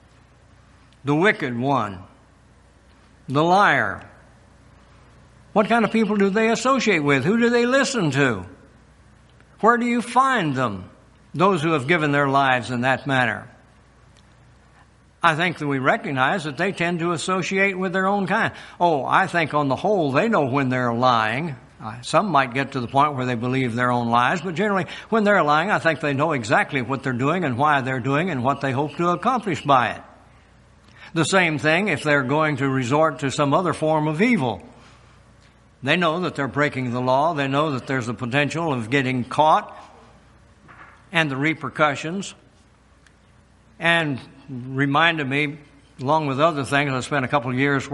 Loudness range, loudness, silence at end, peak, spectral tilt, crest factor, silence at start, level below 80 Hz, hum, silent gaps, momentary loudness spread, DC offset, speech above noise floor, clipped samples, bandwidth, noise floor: 4 LU; -21 LUFS; 0 s; -2 dBFS; -5.5 dB/octave; 20 dB; 1.05 s; -58 dBFS; none; none; 7 LU; under 0.1%; 34 dB; under 0.1%; 11.5 kHz; -54 dBFS